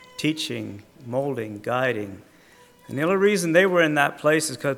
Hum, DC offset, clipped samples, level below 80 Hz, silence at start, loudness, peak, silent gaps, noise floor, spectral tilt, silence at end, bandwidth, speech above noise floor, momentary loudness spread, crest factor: none; under 0.1%; under 0.1%; -68 dBFS; 0.2 s; -22 LUFS; -4 dBFS; none; -53 dBFS; -4.5 dB/octave; 0 s; 17.5 kHz; 30 dB; 15 LU; 20 dB